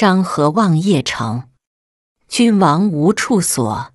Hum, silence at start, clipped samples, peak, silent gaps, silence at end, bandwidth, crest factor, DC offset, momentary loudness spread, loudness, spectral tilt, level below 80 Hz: none; 0 s; under 0.1%; -2 dBFS; 1.67-2.15 s; 0.1 s; 12 kHz; 14 dB; under 0.1%; 9 LU; -15 LUFS; -5 dB/octave; -52 dBFS